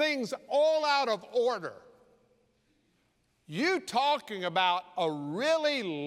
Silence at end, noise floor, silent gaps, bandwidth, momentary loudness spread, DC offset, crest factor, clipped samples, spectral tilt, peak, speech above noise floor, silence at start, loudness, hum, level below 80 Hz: 0 s; -72 dBFS; none; 14.5 kHz; 6 LU; under 0.1%; 18 dB; under 0.1%; -4 dB/octave; -12 dBFS; 43 dB; 0 s; -29 LUFS; none; -82 dBFS